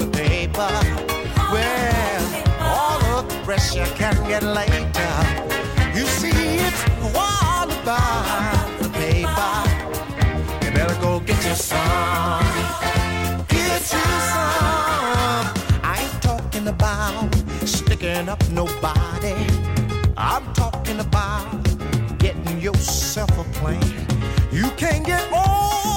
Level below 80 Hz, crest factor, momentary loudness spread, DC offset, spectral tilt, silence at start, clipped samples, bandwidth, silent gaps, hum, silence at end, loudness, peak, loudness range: -28 dBFS; 14 dB; 4 LU; under 0.1%; -4.5 dB/octave; 0 s; under 0.1%; 17 kHz; none; none; 0 s; -20 LUFS; -4 dBFS; 2 LU